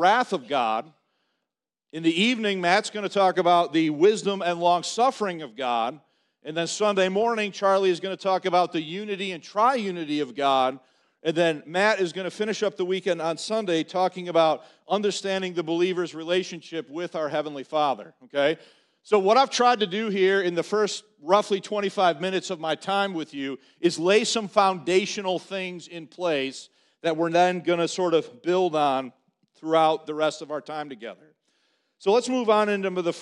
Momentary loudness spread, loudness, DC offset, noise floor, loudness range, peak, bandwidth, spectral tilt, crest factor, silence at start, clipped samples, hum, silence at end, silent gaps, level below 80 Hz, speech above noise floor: 11 LU; -24 LUFS; under 0.1%; -86 dBFS; 4 LU; -4 dBFS; 11 kHz; -4 dB/octave; 20 dB; 0 s; under 0.1%; none; 0 s; none; -76 dBFS; 62 dB